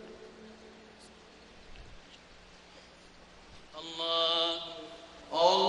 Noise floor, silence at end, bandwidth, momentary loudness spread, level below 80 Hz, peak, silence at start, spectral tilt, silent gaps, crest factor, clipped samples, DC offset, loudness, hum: -55 dBFS; 0 s; 10.5 kHz; 27 LU; -62 dBFS; -12 dBFS; 0 s; -3 dB/octave; none; 24 dB; under 0.1%; under 0.1%; -31 LUFS; none